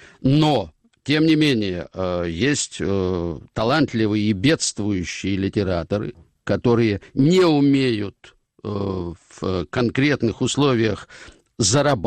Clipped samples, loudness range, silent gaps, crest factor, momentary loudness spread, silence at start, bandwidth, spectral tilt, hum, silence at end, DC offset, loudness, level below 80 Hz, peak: under 0.1%; 2 LU; none; 14 dB; 11 LU; 0.2 s; 10.5 kHz; -5 dB/octave; none; 0 s; under 0.1%; -20 LUFS; -48 dBFS; -6 dBFS